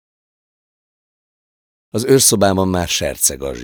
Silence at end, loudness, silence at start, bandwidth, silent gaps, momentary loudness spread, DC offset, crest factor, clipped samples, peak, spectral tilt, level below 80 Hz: 0 s; -14 LUFS; 1.95 s; over 20 kHz; none; 9 LU; under 0.1%; 18 dB; under 0.1%; 0 dBFS; -3.5 dB/octave; -42 dBFS